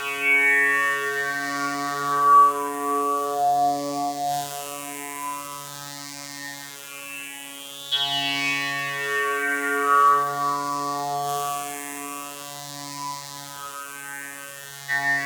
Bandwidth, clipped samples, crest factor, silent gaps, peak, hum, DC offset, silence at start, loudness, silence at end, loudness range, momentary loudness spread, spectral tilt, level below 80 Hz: over 20 kHz; under 0.1%; 18 dB; none; -8 dBFS; none; under 0.1%; 0 s; -23 LUFS; 0 s; 11 LU; 17 LU; -2 dB/octave; -74 dBFS